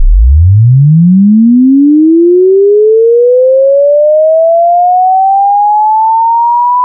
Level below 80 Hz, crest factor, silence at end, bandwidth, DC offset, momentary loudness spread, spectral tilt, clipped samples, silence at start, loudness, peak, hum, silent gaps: -16 dBFS; 4 dB; 0 s; 1.1 kHz; under 0.1%; 2 LU; -17 dB/octave; 0.2%; 0 s; -6 LUFS; 0 dBFS; none; none